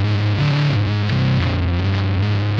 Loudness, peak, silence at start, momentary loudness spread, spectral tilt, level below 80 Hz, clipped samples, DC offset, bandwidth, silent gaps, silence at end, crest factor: -18 LUFS; -6 dBFS; 0 s; 2 LU; -7.5 dB/octave; -34 dBFS; under 0.1%; under 0.1%; 6.8 kHz; none; 0 s; 10 dB